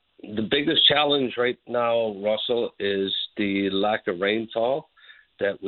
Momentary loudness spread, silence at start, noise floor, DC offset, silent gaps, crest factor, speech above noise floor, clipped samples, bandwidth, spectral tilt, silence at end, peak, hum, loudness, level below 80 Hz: 10 LU; 0.25 s; -52 dBFS; under 0.1%; none; 20 dB; 29 dB; under 0.1%; 4.5 kHz; -9 dB/octave; 0 s; -6 dBFS; none; -23 LUFS; -62 dBFS